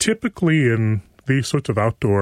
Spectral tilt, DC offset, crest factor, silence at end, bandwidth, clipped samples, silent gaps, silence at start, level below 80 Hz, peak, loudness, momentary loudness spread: -5.5 dB/octave; under 0.1%; 14 dB; 0 s; 13.5 kHz; under 0.1%; none; 0 s; -50 dBFS; -4 dBFS; -20 LUFS; 5 LU